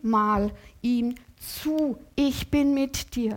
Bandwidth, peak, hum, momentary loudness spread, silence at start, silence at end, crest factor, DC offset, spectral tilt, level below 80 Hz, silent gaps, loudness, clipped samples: 17 kHz; -12 dBFS; none; 9 LU; 0.05 s; 0 s; 14 dB; under 0.1%; -5 dB/octave; -46 dBFS; none; -26 LUFS; under 0.1%